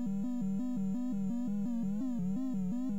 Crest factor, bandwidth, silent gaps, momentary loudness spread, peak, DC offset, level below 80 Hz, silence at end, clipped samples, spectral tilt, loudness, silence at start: 6 dB; 8 kHz; none; 0 LU; -26 dBFS; 0.9%; -62 dBFS; 0 s; under 0.1%; -9 dB/octave; -36 LUFS; 0 s